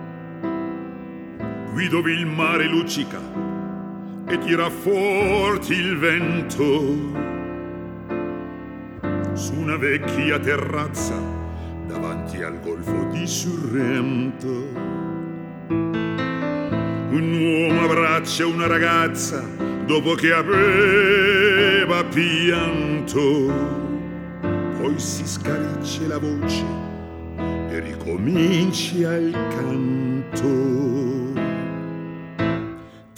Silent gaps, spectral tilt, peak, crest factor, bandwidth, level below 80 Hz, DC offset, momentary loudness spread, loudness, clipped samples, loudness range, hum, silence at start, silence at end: none; -5 dB/octave; -4 dBFS; 18 dB; 18 kHz; -46 dBFS; under 0.1%; 14 LU; -21 LUFS; under 0.1%; 8 LU; none; 0 s; 0.15 s